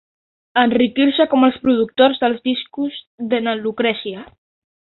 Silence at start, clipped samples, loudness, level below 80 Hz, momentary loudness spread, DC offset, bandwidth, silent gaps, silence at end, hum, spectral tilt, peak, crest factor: 0.55 s; under 0.1%; -17 LUFS; -58 dBFS; 11 LU; under 0.1%; 4.3 kHz; 3.07-3.18 s; 0.6 s; none; -9 dB/octave; -2 dBFS; 16 dB